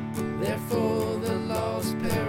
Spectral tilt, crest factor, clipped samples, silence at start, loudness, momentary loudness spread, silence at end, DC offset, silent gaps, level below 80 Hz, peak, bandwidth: -6 dB/octave; 14 dB; under 0.1%; 0 s; -28 LUFS; 3 LU; 0 s; under 0.1%; none; -50 dBFS; -12 dBFS; 17 kHz